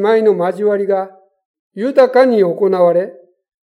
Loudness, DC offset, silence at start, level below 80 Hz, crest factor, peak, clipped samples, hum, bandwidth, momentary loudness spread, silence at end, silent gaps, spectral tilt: -13 LUFS; under 0.1%; 0 s; -76 dBFS; 14 dB; 0 dBFS; under 0.1%; none; 10.5 kHz; 10 LU; 0.5 s; 1.45-1.71 s; -7.5 dB/octave